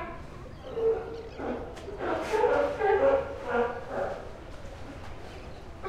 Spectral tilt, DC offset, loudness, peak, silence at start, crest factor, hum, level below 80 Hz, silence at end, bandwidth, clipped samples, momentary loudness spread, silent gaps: -6 dB/octave; under 0.1%; -29 LUFS; -12 dBFS; 0 s; 18 dB; none; -48 dBFS; 0 s; 12.5 kHz; under 0.1%; 19 LU; none